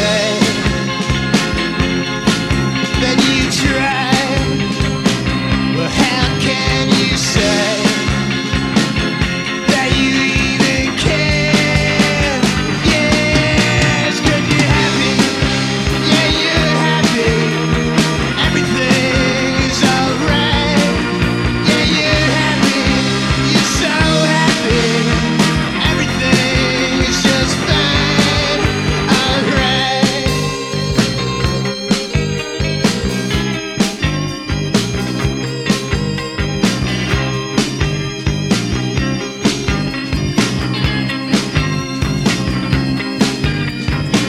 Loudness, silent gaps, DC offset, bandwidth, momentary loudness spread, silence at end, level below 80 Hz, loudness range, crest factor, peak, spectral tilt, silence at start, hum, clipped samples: -14 LUFS; none; under 0.1%; 15 kHz; 6 LU; 0 s; -28 dBFS; 4 LU; 14 dB; 0 dBFS; -4.5 dB/octave; 0 s; none; under 0.1%